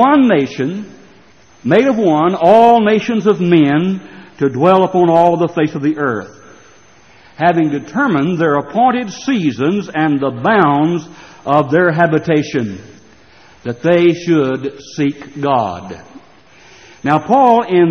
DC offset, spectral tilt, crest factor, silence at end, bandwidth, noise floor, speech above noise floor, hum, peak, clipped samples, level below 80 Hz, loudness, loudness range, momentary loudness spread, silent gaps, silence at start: 0.2%; -7 dB/octave; 14 dB; 0 s; 6.6 kHz; -46 dBFS; 34 dB; none; 0 dBFS; under 0.1%; -54 dBFS; -13 LUFS; 5 LU; 12 LU; none; 0 s